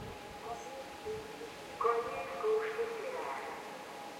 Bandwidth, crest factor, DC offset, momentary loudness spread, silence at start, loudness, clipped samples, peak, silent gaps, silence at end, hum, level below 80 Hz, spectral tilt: 16.5 kHz; 20 dB; under 0.1%; 12 LU; 0 s; -39 LUFS; under 0.1%; -18 dBFS; none; 0 s; none; -68 dBFS; -3.5 dB/octave